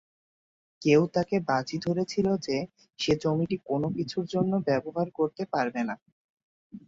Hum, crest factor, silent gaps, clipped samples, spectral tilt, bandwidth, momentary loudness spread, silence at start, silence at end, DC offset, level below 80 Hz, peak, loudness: none; 18 dB; 6.02-6.06 s, 6.12-6.37 s, 6.43-6.70 s; under 0.1%; -6.5 dB/octave; 7.8 kHz; 9 LU; 0.8 s; 0.1 s; under 0.1%; -62 dBFS; -10 dBFS; -28 LUFS